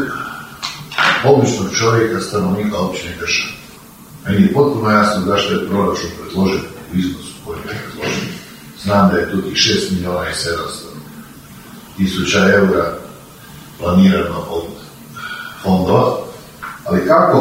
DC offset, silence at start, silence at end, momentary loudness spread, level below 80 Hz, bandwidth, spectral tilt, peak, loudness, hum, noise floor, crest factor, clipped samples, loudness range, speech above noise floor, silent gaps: under 0.1%; 0 s; 0 s; 21 LU; -44 dBFS; 16 kHz; -5 dB/octave; 0 dBFS; -16 LUFS; none; -38 dBFS; 16 dB; under 0.1%; 3 LU; 24 dB; none